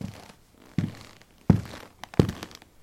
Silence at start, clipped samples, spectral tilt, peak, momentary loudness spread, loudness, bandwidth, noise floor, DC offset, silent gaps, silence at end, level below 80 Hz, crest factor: 0 s; under 0.1%; -7.5 dB/octave; -2 dBFS; 22 LU; -28 LUFS; 15.5 kHz; -53 dBFS; under 0.1%; none; 0.35 s; -46 dBFS; 28 dB